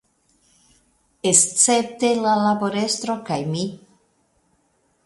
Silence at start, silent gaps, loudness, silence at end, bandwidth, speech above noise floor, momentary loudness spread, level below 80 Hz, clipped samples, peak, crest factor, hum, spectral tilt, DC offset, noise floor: 1.25 s; none; -19 LUFS; 1.3 s; 11.5 kHz; 45 dB; 11 LU; -64 dBFS; under 0.1%; 0 dBFS; 22 dB; none; -3 dB/octave; under 0.1%; -65 dBFS